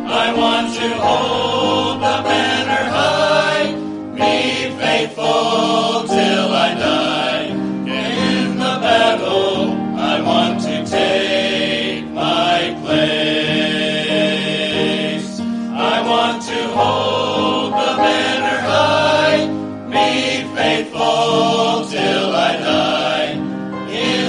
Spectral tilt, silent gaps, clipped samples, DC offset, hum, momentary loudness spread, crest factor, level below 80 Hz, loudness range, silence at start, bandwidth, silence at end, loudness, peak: -4 dB/octave; none; under 0.1%; under 0.1%; none; 6 LU; 16 dB; -56 dBFS; 2 LU; 0 s; 11 kHz; 0 s; -16 LUFS; 0 dBFS